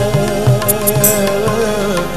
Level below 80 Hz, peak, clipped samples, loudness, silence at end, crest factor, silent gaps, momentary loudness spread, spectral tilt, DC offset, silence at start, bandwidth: -34 dBFS; 0 dBFS; under 0.1%; -13 LUFS; 0 s; 14 dB; none; 4 LU; -4.5 dB/octave; 4%; 0 s; 15 kHz